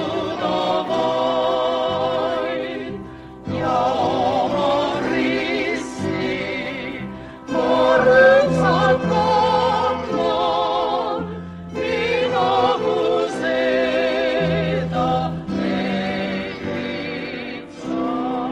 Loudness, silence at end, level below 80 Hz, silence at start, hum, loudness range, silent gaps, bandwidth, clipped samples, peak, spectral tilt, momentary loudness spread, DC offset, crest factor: -20 LUFS; 0 s; -48 dBFS; 0 s; none; 6 LU; none; 10 kHz; under 0.1%; -4 dBFS; -6 dB/octave; 11 LU; under 0.1%; 16 dB